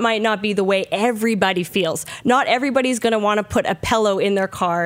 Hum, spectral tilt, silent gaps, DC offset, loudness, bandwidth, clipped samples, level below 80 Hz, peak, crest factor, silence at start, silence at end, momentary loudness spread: none; -4 dB/octave; none; under 0.1%; -19 LUFS; 16 kHz; under 0.1%; -50 dBFS; -2 dBFS; 16 dB; 0 s; 0 s; 3 LU